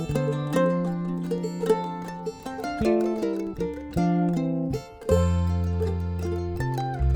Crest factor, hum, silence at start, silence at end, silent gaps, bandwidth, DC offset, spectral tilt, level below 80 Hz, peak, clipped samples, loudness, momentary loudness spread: 18 dB; none; 0 s; 0 s; none; 17.5 kHz; under 0.1%; -8 dB/octave; -36 dBFS; -8 dBFS; under 0.1%; -27 LUFS; 9 LU